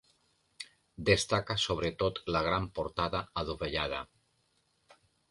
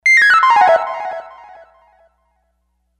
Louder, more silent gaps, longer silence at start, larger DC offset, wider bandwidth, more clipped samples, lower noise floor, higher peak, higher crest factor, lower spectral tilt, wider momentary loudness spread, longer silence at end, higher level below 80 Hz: second, -32 LUFS vs -11 LUFS; neither; first, 0.6 s vs 0.05 s; neither; second, 11.5 kHz vs 14.5 kHz; neither; first, -74 dBFS vs -66 dBFS; second, -10 dBFS vs 0 dBFS; first, 24 dB vs 16 dB; first, -4 dB/octave vs 0 dB/octave; about the same, 19 LU vs 19 LU; second, 1.25 s vs 1.7 s; first, -52 dBFS vs -62 dBFS